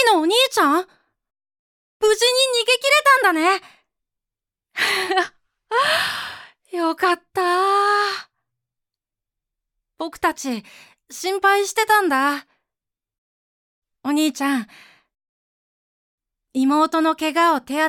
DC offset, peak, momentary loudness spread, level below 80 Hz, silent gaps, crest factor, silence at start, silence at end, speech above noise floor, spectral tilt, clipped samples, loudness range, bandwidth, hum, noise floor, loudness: under 0.1%; -4 dBFS; 15 LU; -66 dBFS; 1.59-2.00 s, 13.18-13.82 s, 15.29-16.18 s; 18 dB; 0 s; 0 s; 69 dB; -1 dB/octave; under 0.1%; 9 LU; 18 kHz; none; -87 dBFS; -18 LUFS